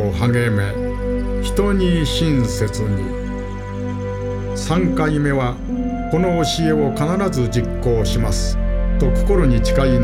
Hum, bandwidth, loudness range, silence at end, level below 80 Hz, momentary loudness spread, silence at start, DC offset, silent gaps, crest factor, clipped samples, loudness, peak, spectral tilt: 50 Hz at -35 dBFS; 14.5 kHz; 2 LU; 0 s; -24 dBFS; 8 LU; 0 s; under 0.1%; none; 14 dB; under 0.1%; -19 LUFS; -4 dBFS; -6 dB/octave